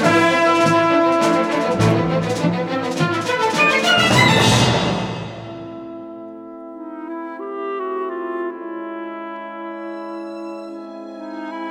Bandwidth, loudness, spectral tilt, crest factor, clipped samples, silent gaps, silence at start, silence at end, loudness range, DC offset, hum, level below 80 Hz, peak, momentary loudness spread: 16.5 kHz; -17 LUFS; -4.5 dB/octave; 18 dB; under 0.1%; none; 0 s; 0 s; 13 LU; under 0.1%; none; -48 dBFS; -2 dBFS; 20 LU